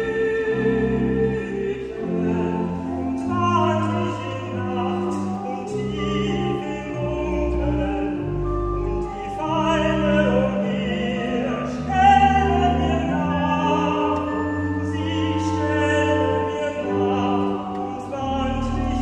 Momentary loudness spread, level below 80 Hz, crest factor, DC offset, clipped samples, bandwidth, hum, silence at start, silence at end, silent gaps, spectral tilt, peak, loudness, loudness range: 8 LU; -34 dBFS; 18 dB; under 0.1%; under 0.1%; 9.8 kHz; none; 0 s; 0 s; none; -7 dB/octave; -4 dBFS; -22 LUFS; 5 LU